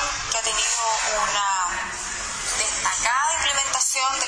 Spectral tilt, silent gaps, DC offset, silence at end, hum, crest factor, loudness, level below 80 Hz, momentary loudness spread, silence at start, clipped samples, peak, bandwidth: 1 dB/octave; none; under 0.1%; 0 s; none; 16 dB; -21 LUFS; -46 dBFS; 7 LU; 0 s; under 0.1%; -8 dBFS; 11 kHz